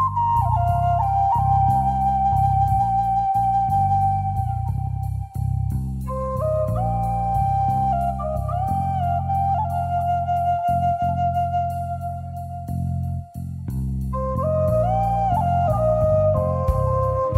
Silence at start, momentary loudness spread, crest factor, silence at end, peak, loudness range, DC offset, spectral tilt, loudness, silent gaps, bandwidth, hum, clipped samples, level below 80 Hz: 0 s; 9 LU; 14 dB; 0 s; -8 dBFS; 5 LU; under 0.1%; -9.5 dB/octave; -22 LUFS; none; 14 kHz; none; under 0.1%; -32 dBFS